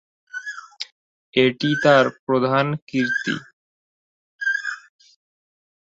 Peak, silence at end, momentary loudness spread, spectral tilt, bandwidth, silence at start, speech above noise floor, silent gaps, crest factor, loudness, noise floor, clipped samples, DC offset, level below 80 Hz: -2 dBFS; 1.15 s; 19 LU; -5.5 dB/octave; 8 kHz; 0.35 s; over 71 dB; 0.92-1.33 s, 2.19-2.27 s, 2.82-2.87 s, 3.53-4.39 s; 20 dB; -21 LUFS; under -90 dBFS; under 0.1%; under 0.1%; -66 dBFS